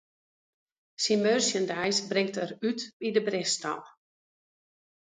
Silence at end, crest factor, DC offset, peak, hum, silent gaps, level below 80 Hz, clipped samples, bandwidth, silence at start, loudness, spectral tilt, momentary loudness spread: 1.15 s; 20 dB; under 0.1%; -12 dBFS; none; 2.93-3.00 s; -76 dBFS; under 0.1%; 9.6 kHz; 1 s; -28 LUFS; -3 dB/octave; 8 LU